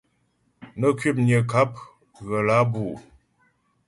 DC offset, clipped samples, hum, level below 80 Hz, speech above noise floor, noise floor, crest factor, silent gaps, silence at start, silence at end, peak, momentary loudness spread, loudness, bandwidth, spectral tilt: under 0.1%; under 0.1%; none; -58 dBFS; 46 dB; -68 dBFS; 18 dB; none; 0.6 s; 0.85 s; -6 dBFS; 21 LU; -22 LUFS; 11.5 kHz; -7.5 dB/octave